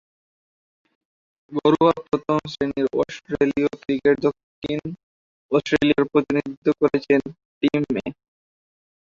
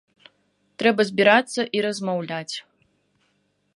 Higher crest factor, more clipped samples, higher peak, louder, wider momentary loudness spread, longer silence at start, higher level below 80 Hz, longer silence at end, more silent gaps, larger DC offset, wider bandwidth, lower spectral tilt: about the same, 18 dB vs 22 dB; neither; about the same, -4 dBFS vs -2 dBFS; about the same, -22 LUFS vs -21 LUFS; second, 10 LU vs 13 LU; first, 1.5 s vs 0.8 s; first, -56 dBFS vs -72 dBFS; about the same, 1.05 s vs 1.15 s; first, 4.43-4.62 s, 5.03-5.49 s, 6.57-6.62 s, 7.45-7.61 s vs none; neither; second, 7.4 kHz vs 11.5 kHz; first, -7 dB/octave vs -4 dB/octave